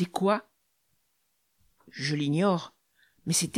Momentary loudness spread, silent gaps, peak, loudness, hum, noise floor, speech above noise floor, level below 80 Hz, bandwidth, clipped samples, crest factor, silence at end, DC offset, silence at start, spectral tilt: 17 LU; none; -12 dBFS; -28 LUFS; none; -75 dBFS; 48 dB; -72 dBFS; 16 kHz; under 0.1%; 18 dB; 0 s; under 0.1%; 0 s; -4.5 dB/octave